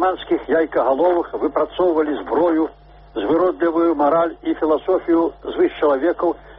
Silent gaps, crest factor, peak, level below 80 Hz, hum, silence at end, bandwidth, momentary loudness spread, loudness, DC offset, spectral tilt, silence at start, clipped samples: none; 14 dB; -4 dBFS; -48 dBFS; none; 0 s; 4 kHz; 5 LU; -19 LUFS; under 0.1%; -4 dB/octave; 0 s; under 0.1%